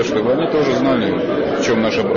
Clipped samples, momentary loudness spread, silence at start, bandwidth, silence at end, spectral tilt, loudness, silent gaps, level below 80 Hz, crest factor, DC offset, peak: under 0.1%; 3 LU; 0 s; 7.4 kHz; 0 s; -5.5 dB/octave; -17 LUFS; none; -48 dBFS; 10 dB; under 0.1%; -6 dBFS